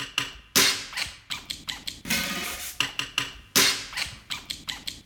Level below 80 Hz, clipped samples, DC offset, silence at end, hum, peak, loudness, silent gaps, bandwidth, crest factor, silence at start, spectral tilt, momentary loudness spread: -52 dBFS; under 0.1%; under 0.1%; 0.05 s; none; -4 dBFS; -26 LUFS; none; over 20 kHz; 24 dB; 0 s; -0.5 dB/octave; 13 LU